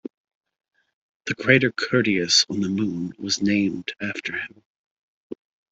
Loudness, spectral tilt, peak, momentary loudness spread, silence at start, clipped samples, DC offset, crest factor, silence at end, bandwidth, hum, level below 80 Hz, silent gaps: -22 LUFS; -3.5 dB/octave; -2 dBFS; 24 LU; 1.25 s; under 0.1%; under 0.1%; 22 dB; 0.4 s; 8.2 kHz; none; -62 dBFS; 4.65-5.30 s